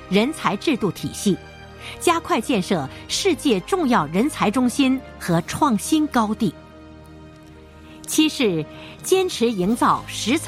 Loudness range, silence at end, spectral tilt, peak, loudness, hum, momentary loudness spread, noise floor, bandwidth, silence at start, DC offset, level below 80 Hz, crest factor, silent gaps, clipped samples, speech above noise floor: 3 LU; 0 s; -4.5 dB/octave; -4 dBFS; -21 LUFS; none; 7 LU; -43 dBFS; 16 kHz; 0 s; under 0.1%; -48 dBFS; 18 dB; none; under 0.1%; 23 dB